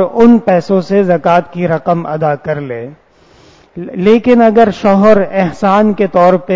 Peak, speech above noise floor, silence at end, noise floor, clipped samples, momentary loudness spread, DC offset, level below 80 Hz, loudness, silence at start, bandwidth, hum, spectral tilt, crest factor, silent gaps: 0 dBFS; 34 dB; 0 s; -44 dBFS; 0.9%; 12 LU; under 0.1%; -46 dBFS; -10 LUFS; 0 s; 7.6 kHz; none; -8 dB/octave; 10 dB; none